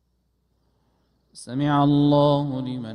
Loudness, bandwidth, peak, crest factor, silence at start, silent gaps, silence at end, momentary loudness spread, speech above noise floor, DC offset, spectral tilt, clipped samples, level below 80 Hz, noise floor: -21 LUFS; 10.5 kHz; -8 dBFS; 16 dB; 1.35 s; none; 0 s; 14 LU; 49 dB; under 0.1%; -8 dB/octave; under 0.1%; -58 dBFS; -69 dBFS